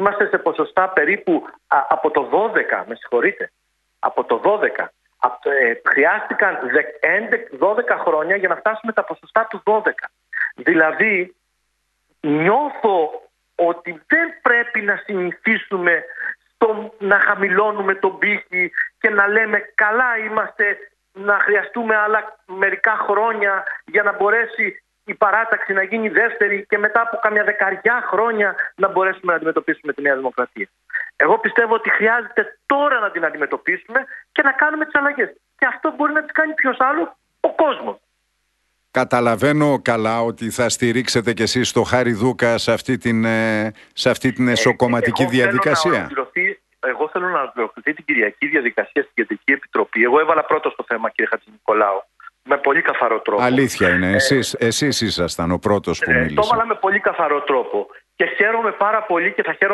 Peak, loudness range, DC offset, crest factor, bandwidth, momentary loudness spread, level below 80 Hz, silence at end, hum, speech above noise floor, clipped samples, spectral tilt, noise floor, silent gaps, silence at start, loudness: 0 dBFS; 2 LU; under 0.1%; 18 dB; 12 kHz; 7 LU; -54 dBFS; 0 s; none; 51 dB; under 0.1%; -4.5 dB/octave; -70 dBFS; none; 0 s; -18 LUFS